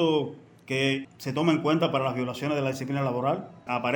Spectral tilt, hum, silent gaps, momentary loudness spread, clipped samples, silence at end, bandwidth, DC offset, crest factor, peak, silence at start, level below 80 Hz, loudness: -6 dB/octave; none; none; 8 LU; under 0.1%; 0 s; 17 kHz; under 0.1%; 18 dB; -10 dBFS; 0 s; -68 dBFS; -27 LUFS